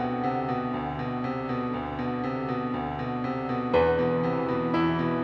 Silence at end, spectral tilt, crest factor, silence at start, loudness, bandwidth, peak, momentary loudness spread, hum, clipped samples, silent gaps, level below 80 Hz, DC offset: 0 s; -9 dB/octave; 16 dB; 0 s; -28 LUFS; 6.2 kHz; -10 dBFS; 7 LU; none; under 0.1%; none; -50 dBFS; under 0.1%